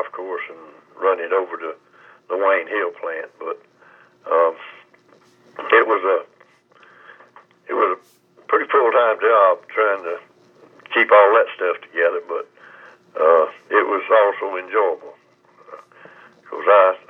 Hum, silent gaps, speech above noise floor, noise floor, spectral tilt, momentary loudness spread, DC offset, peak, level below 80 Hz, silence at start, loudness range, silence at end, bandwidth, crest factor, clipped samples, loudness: none; none; 36 dB; -54 dBFS; -4.5 dB/octave; 17 LU; under 0.1%; 0 dBFS; under -90 dBFS; 0 s; 6 LU; 0.15 s; 4.1 kHz; 20 dB; under 0.1%; -18 LUFS